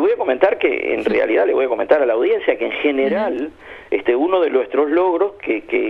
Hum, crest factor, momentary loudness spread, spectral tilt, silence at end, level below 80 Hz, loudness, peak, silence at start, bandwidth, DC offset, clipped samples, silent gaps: none; 16 dB; 5 LU; -6.5 dB/octave; 0 s; -56 dBFS; -17 LUFS; -2 dBFS; 0 s; 5.2 kHz; under 0.1%; under 0.1%; none